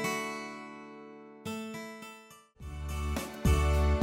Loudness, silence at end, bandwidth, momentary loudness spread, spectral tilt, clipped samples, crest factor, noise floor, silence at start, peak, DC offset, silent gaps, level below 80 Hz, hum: -34 LUFS; 0 s; 16.5 kHz; 21 LU; -5.5 dB/octave; under 0.1%; 20 dB; -54 dBFS; 0 s; -12 dBFS; under 0.1%; none; -36 dBFS; none